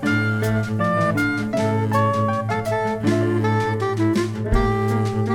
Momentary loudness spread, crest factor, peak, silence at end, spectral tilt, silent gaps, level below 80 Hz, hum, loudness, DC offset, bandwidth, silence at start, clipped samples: 3 LU; 14 dB; -6 dBFS; 0 s; -7 dB/octave; none; -34 dBFS; none; -21 LUFS; under 0.1%; 14.5 kHz; 0 s; under 0.1%